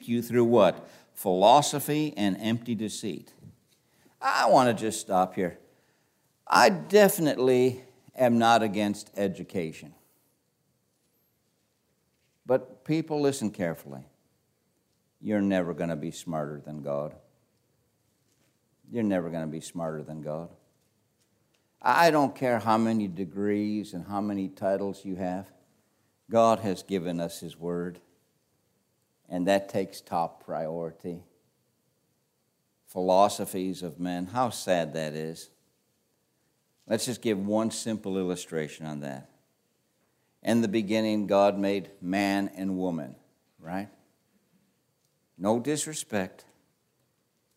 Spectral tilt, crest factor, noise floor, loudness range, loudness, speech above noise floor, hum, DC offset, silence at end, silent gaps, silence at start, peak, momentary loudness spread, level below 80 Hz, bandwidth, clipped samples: -5 dB/octave; 24 dB; -74 dBFS; 10 LU; -27 LUFS; 47 dB; none; under 0.1%; 1.3 s; none; 0 s; -4 dBFS; 16 LU; -72 dBFS; 16 kHz; under 0.1%